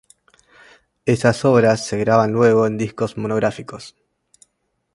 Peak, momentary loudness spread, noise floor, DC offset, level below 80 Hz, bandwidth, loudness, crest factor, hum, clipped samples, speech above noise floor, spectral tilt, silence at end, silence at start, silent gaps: 0 dBFS; 12 LU; -71 dBFS; under 0.1%; -54 dBFS; 11.5 kHz; -18 LUFS; 20 dB; none; under 0.1%; 54 dB; -6.5 dB/octave; 1.05 s; 1.05 s; none